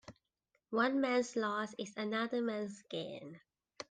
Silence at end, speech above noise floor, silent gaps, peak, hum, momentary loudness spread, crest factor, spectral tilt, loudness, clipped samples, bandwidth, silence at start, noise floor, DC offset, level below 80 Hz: 0.1 s; 46 dB; none; -20 dBFS; none; 14 LU; 18 dB; -4.5 dB/octave; -37 LUFS; under 0.1%; 9.6 kHz; 0.1 s; -83 dBFS; under 0.1%; -82 dBFS